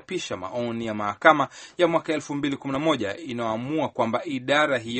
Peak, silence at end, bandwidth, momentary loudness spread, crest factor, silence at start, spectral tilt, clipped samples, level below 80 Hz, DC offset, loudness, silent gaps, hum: 0 dBFS; 0 s; 8.8 kHz; 11 LU; 24 dB; 0.1 s; -5 dB/octave; under 0.1%; -64 dBFS; under 0.1%; -25 LUFS; none; none